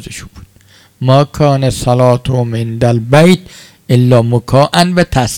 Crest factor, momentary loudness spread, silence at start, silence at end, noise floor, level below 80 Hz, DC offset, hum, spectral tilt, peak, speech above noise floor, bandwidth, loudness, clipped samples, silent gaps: 10 dB; 7 LU; 0 s; 0 s; -44 dBFS; -36 dBFS; under 0.1%; none; -6.5 dB/octave; 0 dBFS; 34 dB; 16 kHz; -11 LUFS; 2%; none